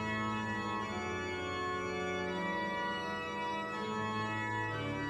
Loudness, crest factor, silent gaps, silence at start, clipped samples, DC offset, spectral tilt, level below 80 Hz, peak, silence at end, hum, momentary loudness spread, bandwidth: -37 LUFS; 12 dB; none; 0 s; under 0.1%; under 0.1%; -5 dB/octave; -62 dBFS; -24 dBFS; 0 s; none; 2 LU; 13 kHz